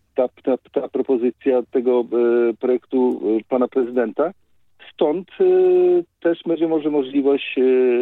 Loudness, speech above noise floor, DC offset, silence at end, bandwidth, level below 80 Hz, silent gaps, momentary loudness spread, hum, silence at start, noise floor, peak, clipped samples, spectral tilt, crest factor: -19 LUFS; 31 dB; under 0.1%; 0 s; 4 kHz; -72 dBFS; none; 7 LU; none; 0.15 s; -49 dBFS; -6 dBFS; under 0.1%; -8.5 dB/octave; 12 dB